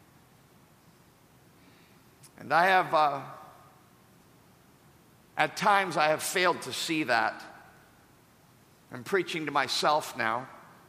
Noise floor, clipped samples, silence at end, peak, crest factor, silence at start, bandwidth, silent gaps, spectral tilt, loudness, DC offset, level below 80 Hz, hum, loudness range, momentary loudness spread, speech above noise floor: -60 dBFS; under 0.1%; 0.3 s; -8 dBFS; 24 dB; 2.4 s; 15.5 kHz; none; -3 dB/octave; -27 LUFS; under 0.1%; -76 dBFS; none; 3 LU; 22 LU; 32 dB